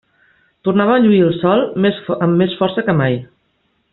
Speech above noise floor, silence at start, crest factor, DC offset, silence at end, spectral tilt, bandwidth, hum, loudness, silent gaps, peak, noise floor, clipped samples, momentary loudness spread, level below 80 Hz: 49 dB; 0.65 s; 14 dB; under 0.1%; 0.7 s; -6 dB/octave; 4.2 kHz; none; -15 LUFS; none; -2 dBFS; -63 dBFS; under 0.1%; 7 LU; -54 dBFS